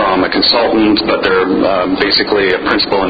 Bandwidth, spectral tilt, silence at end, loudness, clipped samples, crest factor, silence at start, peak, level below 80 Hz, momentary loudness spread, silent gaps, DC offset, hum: 6.6 kHz; -6.5 dB/octave; 0 s; -11 LUFS; under 0.1%; 12 dB; 0 s; 0 dBFS; -40 dBFS; 3 LU; none; under 0.1%; none